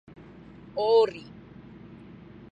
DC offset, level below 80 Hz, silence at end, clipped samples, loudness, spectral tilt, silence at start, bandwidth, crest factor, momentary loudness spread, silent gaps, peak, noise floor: under 0.1%; -62 dBFS; 1.1 s; under 0.1%; -25 LUFS; -6 dB/octave; 0.75 s; 7.8 kHz; 18 dB; 26 LU; none; -12 dBFS; -48 dBFS